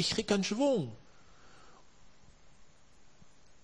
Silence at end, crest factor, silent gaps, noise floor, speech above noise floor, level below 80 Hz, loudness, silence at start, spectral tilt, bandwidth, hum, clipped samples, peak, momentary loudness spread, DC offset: 2.65 s; 22 dB; none; -63 dBFS; 32 dB; -64 dBFS; -31 LUFS; 0 s; -4.5 dB/octave; 10.5 kHz; none; under 0.1%; -16 dBFS; 15 LU; 0.2%